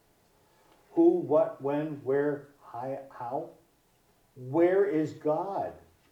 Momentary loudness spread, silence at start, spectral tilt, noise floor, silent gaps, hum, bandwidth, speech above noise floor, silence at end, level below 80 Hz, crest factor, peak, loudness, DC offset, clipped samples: 15 LU; 0.95 s; -9 dB/octave; -67 dBFS; none; none; 7.6 kHz; 39 dB; 0.3 s; -74 dBFS; 18 dB; -12 dBFS; -29 LUFS; under 0.1%; under 0.1%